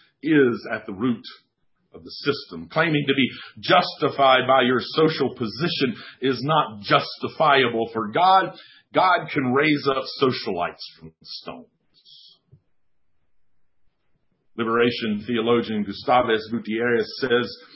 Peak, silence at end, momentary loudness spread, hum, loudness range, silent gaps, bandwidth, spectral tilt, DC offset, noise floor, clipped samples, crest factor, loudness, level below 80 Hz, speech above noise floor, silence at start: -2 dBFS; 0.2 s; 13 LU; none; 9 LU; none; 5.8 kHz; -9 dB/octave; under 0.1%; -77 dBFS; under 0.1%; 20 dB; -22 LUFS; -62 dBFS; 55 dB; 0.25 s